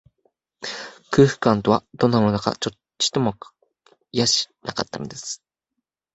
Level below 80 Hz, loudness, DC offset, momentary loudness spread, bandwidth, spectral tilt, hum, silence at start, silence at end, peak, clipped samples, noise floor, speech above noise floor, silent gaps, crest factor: -54 dBFS; -22 LUFS; under 0.1%; 15 LU; 8.4 kHz; -4.5 dB/octave; none; 0.6 s; 0.8 s; -2 dBFS; under 0.1%; -81 dBFS; 60 dB; none; 22 dB